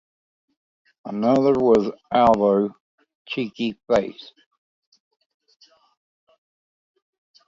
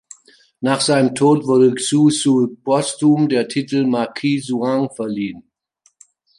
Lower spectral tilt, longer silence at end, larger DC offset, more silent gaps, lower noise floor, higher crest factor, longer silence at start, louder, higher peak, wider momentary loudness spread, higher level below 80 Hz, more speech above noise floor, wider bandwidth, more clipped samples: first, -7 dB/octave vs -5 dB/octave; first, 3.35 s vs 1 s; neither; first, 2.80-2.98 s, 3.15-3.25 s vs none; first, under -90 dBFS vs -61 dBFS; about the same, 20 dB vs 16 dB; first, 1.05 s vs 0.6 s; second, -20 LUFS vs -17 LUFS; about the same, -4 dBFS vs -2 dBFS; first, 16 LU vs 9 LU; first, -56 dBFS vs -64 dBFS; first, over 70 dB vs 44 dB; second, 7.8 kHz vs 11.5 kHz; neither